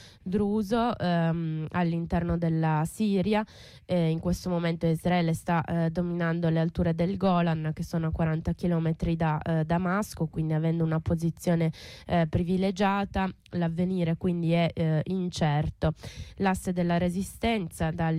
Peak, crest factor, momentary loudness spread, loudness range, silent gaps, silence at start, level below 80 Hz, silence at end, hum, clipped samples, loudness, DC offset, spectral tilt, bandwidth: -16 dBFS; 12 dB; 5 LU; 1 LU; none; 0 s; -46 dBFS; 0 s; none; under 0.1%; -28 LUFS; under 0.1%; -7.5 dB/octave; 14 kHz